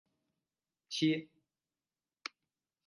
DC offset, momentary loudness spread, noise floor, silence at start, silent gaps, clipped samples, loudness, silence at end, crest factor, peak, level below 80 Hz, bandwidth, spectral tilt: under 0.1%; 15 LU; under -90 dBFS; 0.9 s; none; under 0.1%; -35 LUFS; 1.6 s; 22 dB; -20 dBFS; -88 dBFS; 11.5 kHz; -4.5 dB/octave